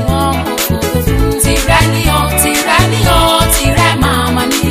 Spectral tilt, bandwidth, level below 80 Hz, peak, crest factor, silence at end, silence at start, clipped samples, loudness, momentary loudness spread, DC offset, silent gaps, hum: -4 dB/octave; 16 kHz; -20 dBFS; 0 dBFS; 10 dB; 0 s; 0 s; under 0.1%; -11 LUFS; 5 LU; 0.2%; none; none